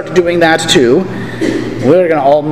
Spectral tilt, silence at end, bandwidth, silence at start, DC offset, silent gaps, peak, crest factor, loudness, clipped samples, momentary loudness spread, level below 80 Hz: -4.5 dB/octave; 0 s; 15 kHz; 0 s; 2%; none; 0 dBFS; 10 dB; -10 LUFS; 0.4%; 8 LU; -40 dBFS